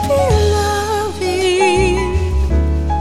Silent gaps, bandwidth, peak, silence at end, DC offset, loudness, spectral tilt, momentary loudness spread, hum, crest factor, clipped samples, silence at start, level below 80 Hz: none; 14 kHz; -2 dBFS; 0 s; under 0.1%; -15 LUFS; -5.5 dB/octave; 5 LU; none; 12 dB; under 0.1%; 0 s; -20 dBFS